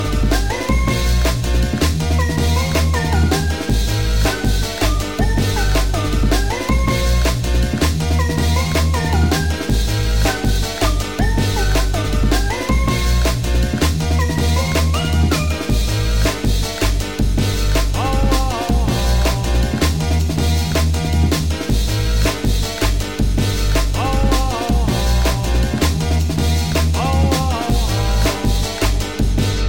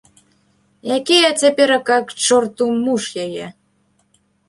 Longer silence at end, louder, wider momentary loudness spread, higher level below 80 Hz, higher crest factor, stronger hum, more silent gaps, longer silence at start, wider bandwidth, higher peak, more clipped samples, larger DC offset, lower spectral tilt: second, 0 s vs 1 s; about the same, -18 LUFS vs -16 LUFS; second, 2 LU vs 14 LU; first, -18 dBFS vs -64 dBFS; about the same, 14 dB vs 16 dB; neither; neither; second, 0 s vs 0.85 s; first, 17 kHz vs 11.5 kHz; about the same, -2 dBFS vs -2 dBFS; neither; first, 1% vs under 0.1%; first, -5 dB/octave vs -2 dB/octave